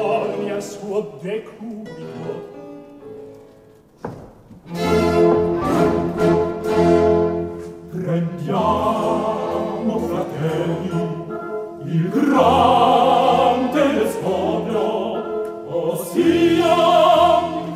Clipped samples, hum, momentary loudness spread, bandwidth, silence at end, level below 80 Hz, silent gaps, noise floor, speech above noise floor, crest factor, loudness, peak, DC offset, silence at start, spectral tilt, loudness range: under 0.1%; none; 19 LU; 16 kHz; 0 s; -46 dBFS; none; -48 dBFS; 20 dB; 16 dB; -18 LUFS; -2 dBFS; under 0.1%; 0 s; -6.5 dB/octave; 13 LU